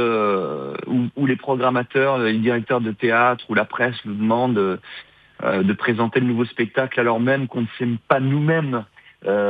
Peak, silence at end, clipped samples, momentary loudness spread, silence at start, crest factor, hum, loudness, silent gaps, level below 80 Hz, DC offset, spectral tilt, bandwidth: -2 dBFS; 0 s; under 0.1%; 7 LU; 0 s; 18 dB; none; -20 LUFS; none; -70 dBFS; under 0.1%; -9.5 dB/octave; 4.8 kHz